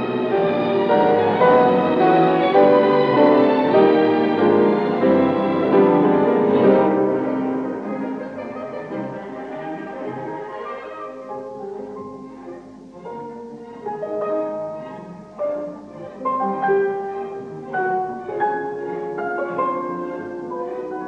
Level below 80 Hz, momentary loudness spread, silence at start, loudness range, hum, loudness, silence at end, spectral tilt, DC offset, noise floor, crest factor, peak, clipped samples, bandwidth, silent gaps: -62 dBFS; 18 LU; 0 s; 16 LU; none; -19 LUFS; 0 s; -8.5 dB/octave; under 0.1%; -39 dBFS; 16 dB; -4 dBFS; under 0.1%; 6.4 kHz; none